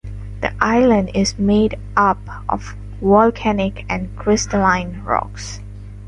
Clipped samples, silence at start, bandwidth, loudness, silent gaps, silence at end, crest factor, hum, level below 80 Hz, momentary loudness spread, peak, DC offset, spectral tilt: under 0.1%; 0.05 s; 10.5 kHz; -18 LUFS; none; 0 s; 16 dB; 50 Hz at -30 dBFS; -34 dBFS; 16 LU; -2 dBFS; under 0.1%; -5.5 dB/octave